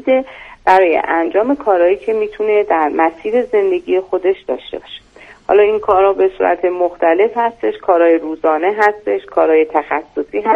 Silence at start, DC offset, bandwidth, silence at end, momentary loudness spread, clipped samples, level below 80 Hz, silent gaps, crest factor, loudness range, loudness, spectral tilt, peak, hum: 0.05 s; under 0.1%; 7 kHz; 0 s; 9 LU; under 0.1%; -50 dBFS; none; 14 dB; 2 LU; -14 LUFS; -6 dB/octave; 0 dBFS; none